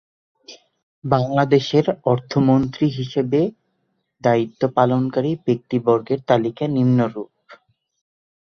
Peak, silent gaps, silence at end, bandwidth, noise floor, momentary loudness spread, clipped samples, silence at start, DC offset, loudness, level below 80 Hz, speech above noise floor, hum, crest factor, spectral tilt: -2 dBFS; 0.83-1.02 s; 1 s; 6.8 kHz; -71 dBFS; 6 LU; under 0.1%; 0.5 s; under 0.1%; -19 LUFS; -56 dBFS; 52 dB; none; 18 dB; -8 dB/octave